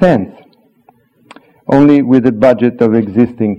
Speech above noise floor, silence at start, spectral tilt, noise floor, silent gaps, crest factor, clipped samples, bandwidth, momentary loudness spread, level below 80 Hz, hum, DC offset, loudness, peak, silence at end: 41 dB; 0 s; -9 dB/octave; -50 dBFS; none; 12 dB; 0.3%; 7.2 kHz; 8 LU; -46 dBFS; none; under 0.1%; -10 LUFS; 0 dBFS; 0 s